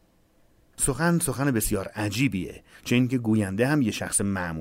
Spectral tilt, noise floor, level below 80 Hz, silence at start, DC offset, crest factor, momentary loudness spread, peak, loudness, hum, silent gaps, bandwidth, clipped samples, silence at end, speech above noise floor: -5 dB/octave; -61 dBFS; -46 dBFS; 0.8 s; under 0.1%; 16 dB; 6 LU; -10 dBFS; -25 LUFS; none; none; 16 kHz; under 0.1%; 0 s; 36 dB